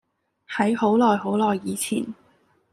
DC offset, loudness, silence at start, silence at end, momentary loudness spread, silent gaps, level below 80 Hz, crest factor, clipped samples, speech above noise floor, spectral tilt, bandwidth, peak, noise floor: under 0.1%; -22 LUFS; 0.5 s; 0.6 s; 11 LU; none; -68 dBFS; 18 dB; under 0.1%; 40 dB; -5 dB/octave; 15 kHz; -6 dBFS; -62 dBFS